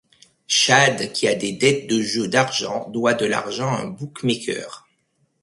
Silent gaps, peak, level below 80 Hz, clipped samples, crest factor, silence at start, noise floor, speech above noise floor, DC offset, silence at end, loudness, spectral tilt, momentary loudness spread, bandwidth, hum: none; 0 dBFS; -62 dBFS; under 0.1%; 20 dB; 0.5 s; -67 dBFS; 47 dB; under 0.1%; 0.65 s; -20 LUFS; -3 dB/octave; 12 LU; 11.5 kHz; none